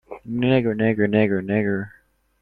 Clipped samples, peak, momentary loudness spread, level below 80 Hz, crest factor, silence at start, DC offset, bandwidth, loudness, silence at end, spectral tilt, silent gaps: under 0.1%; -4 dBFS; 10 LU; -54 dBFS; 18 dB; 0.1 s; under 0.1%; 4.6 kHz; -21 LUFS; 0.55 s; -10 dB/octave; none